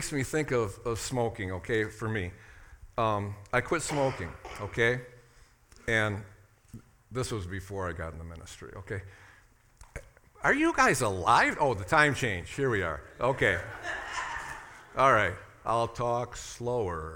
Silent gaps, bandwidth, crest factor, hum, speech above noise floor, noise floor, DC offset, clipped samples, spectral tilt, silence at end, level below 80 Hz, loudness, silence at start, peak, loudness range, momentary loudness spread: none; 18 kHz; 24 dB; none; 31 dB; -60 dBFS; under 0.1%; under 0.1%; -4.5 dB/octave; 0 s; -52 dBFS; -29 LUFS; 0 s; -6 dBFS; 11 LU; 17 LU